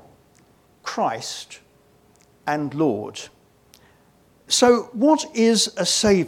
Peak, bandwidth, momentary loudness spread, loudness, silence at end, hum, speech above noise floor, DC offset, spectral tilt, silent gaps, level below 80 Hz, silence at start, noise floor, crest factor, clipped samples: -2 dBFS; 18.5 kHz; 17 LU; -20 LUFS; 0 s; none; 37 dB; under 0.1%; -3.5 dB/octave; none; -54 dBFS; 0.85 s; -57 dBFS; 20 dB; under 0.1%